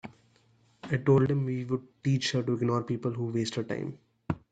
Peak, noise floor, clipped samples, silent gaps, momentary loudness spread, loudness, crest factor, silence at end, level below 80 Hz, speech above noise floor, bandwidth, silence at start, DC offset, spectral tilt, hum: -12 dBFS; -65 dBFS; under 0.1%; none; 14 LU; -30 LUFS; 18 dB; 0.15 s; -62 dBFS; 36 dB; 9 kHz; 0.05 s; under 0.1%; -6.5 dB/octave; none